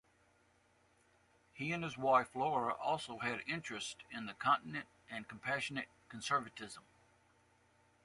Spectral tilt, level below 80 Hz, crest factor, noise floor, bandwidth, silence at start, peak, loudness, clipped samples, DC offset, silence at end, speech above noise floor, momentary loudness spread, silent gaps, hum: -4 dB/octave; -76 dBFS; 22 dB; -72 dBFS; 11.5 kHz; 1.55 s; -18 dBFS; -38 LUFS; under 0.1%; under 0.1%; 1.25 s; 34 dB; 16 LU; none; none